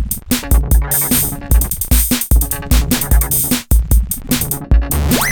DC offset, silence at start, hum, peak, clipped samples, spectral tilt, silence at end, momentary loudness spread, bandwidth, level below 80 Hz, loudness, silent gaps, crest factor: under 0.1%; 0 s; none; 0 dBFS; under 0.1%; -4 dB/octave; 0 s; 4 LU; 19.5 kHz; -16 dBFS; -14 LUFS; none; 12 dB